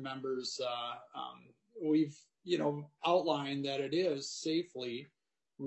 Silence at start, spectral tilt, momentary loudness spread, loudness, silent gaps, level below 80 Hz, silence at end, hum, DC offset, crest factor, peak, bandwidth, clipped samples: 0 s; -5 dB/octave; 13 LU; -36 LUFS; none; -88 dBFS; 0 s; none; under 0.1%; 18 dB; -18 dBFS; 8.2 kHz; under 0.1%